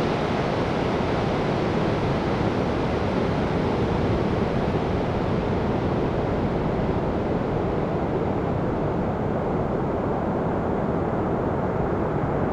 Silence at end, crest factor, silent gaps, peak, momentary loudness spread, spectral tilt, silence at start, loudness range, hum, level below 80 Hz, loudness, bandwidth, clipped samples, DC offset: 0 s; 12 dB; none; -12 dBFS; 2 LU; -8 dB/octave; 0 s; 1 LU; none; -38 dBFS; -24 LUFS; 10.5 kHz; under 0.1%; under 0.1%